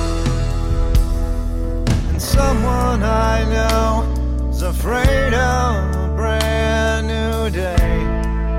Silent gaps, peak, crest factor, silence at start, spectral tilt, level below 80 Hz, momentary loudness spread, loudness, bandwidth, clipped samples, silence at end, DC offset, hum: none; -4 dBFS; 14 dB; 0 s; -5.5 dB/octave; -18 dBFS; 5 LU; -18 LUFS; 16 kHz; under 0.1%; 0 s; under 0.1%; none